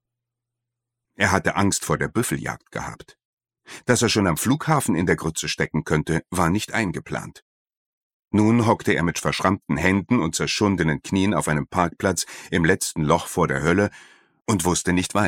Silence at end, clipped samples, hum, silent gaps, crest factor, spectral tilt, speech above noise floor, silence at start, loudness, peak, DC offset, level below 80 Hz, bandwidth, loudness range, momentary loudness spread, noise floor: 0 s; under 0.1%; none; 3.25-3.37 s, 7.42-7.66 s, 7.77-8.20 s; 22 dB; -4.5 dB/octave; 62 dB; 1.2 s; -22 LUFS; -2 dBFS; under 0.1%; -46 dBFS; 17 kHz; 4 LU; 8 LU; -84 dBFS